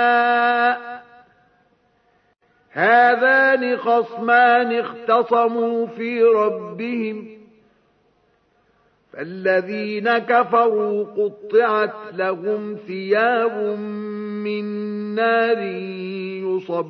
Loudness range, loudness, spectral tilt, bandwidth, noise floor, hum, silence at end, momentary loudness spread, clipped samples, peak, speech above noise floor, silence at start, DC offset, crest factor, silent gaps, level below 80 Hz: 7 LU; -19 LUFS; -7.5 dB/octave; 5.8 kHz; -62 dBFS; none; 0 s; 14 LU; under 0.1%; -4 dBFS; 43 dB; 0 s; under 0.1%; 16 dB; none; -76 dBFS